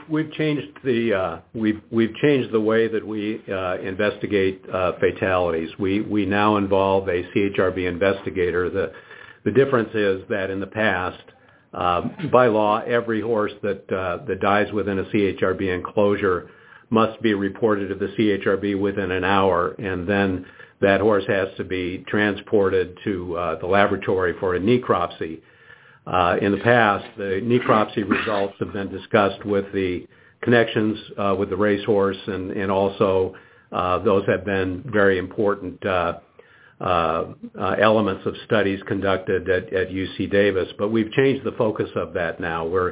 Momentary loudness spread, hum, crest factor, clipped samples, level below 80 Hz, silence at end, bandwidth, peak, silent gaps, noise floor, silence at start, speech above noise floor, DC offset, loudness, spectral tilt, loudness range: 8 LU; none; 20 dB; under 0.1%; -48 dBFS; 0 s; 4 kHz; 0 dBFS; none; -51 dBFS; 0 s; 30 dB; under 0.1%; -22 LUFS; -10.5 dB/octave; 2 LU